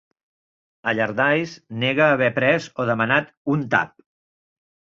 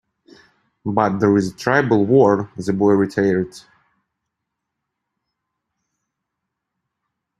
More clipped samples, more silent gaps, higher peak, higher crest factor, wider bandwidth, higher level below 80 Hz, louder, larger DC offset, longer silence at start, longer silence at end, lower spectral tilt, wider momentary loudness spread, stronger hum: neither; first, 3.37-3.45 s vs none; about the same, -2 dBFS vs -2 dBFS; about the same, 20 dB vs 20 dB; second, 7.8 kHz vs 12 kHz; about the same, -62 dBFS vs -58 dBFS; second, -20 LUFS vs -17 LUFS; neither; about the same, 0.85 s vs 0.85 s; second, 1.1 s vs 3.8 s; second, -6 dB/octave vs -7.5 dB/octave; about the same, 7 LU vs 9 LU; neither